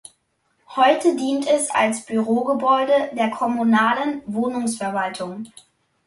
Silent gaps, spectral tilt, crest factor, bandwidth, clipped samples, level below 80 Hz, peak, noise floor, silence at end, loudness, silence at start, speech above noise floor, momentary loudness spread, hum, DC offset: none; -4 dB/octave; 18 dB; 11.5 kHz; under 0.1%; -66 dBFS; -4 dBFS; -68 dBFS; 0.6 s; -20 LUFS; 0.7 s; 48 dB; 10 LU; none; under 0.1%